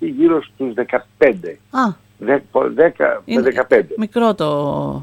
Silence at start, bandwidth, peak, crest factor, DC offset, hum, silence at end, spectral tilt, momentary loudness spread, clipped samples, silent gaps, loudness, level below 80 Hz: 0 s; 12 kHz; 0 dBFS; 16 dB; under 0.1%; none; 0 s; -7 dB/octave; 8 LU; under 0.1%; none; -17 LUFS; -52 dBFS